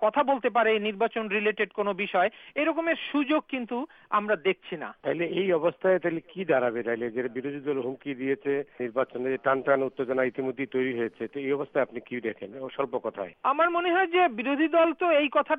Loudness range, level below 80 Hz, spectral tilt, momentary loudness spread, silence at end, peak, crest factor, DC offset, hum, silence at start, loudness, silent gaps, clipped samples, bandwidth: 3 LU; -74 dBFS; -8 dB/octave; 10 LU; 0 s; -10 dBFS; 16 dB; under 0.1%; none; 0 s; -27 LUFS; none; under 0.1%; 4.8 kHz